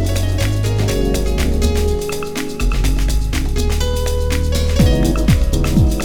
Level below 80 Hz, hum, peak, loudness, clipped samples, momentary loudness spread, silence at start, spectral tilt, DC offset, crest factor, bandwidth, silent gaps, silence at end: -18 dBFS; none; 0 dBFS; -18 LUFS; under 0.1%; 6 LU; 0 s; -5.5 dB/octave; under 0.1%; 14 dB; 19.5 kHz; none; 0 s